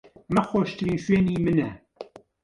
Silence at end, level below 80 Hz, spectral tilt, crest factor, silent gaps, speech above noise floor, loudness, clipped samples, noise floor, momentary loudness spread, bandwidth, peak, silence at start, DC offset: 0.4 s; -50 dBFS; -7.5 dB/octave; 18 dB; none; 21 dB; -24 LUFS; under 0.1%; -44 dBFS; 21 LU; 11 kHz; -8 dBFS; 0.3 s; under 0.1%